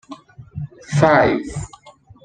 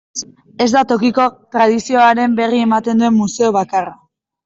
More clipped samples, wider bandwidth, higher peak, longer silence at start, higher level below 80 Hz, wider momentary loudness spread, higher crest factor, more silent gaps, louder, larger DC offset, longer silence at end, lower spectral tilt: neither; first, 9.4 kHz vs 7.8 kHz; about the same, -2 dBFS vs -2 dBFS; about the same, 0.1 s vs 0.15 s; first, -46 dBFS vs -58 dBFS; first, 23 LU vs 10 LU; first, 18 dB vs 12 dB; neither; about the same, -16 LUFS vs -14 LUFS; neither; second, 0.35 s vs 0.5 s; first, -6.5 dB/octave vs -4.5 dB/octave